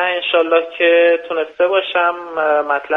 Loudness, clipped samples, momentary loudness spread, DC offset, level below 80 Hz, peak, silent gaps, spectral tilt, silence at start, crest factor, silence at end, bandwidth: -15 LUFS; under 0.1%; 6 LU; under 0.1%; -66 dBFS; 0 dBFS; none; -4.5 dB/octave; 0 s; 14 dB; 0 s; 4.1 kHz